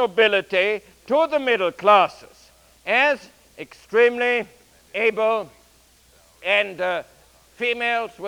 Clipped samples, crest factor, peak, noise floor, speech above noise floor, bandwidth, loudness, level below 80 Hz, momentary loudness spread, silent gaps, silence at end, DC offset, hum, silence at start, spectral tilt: under 0.1%; 20 dB; -2 dBFS; -55 dBFS; 35 dB; 16.5 kHz; -20 LUFS; -62 dBFS; 15 LU; none; 0 s; under 0.1%; none; 0 s; -3.5 dB/octave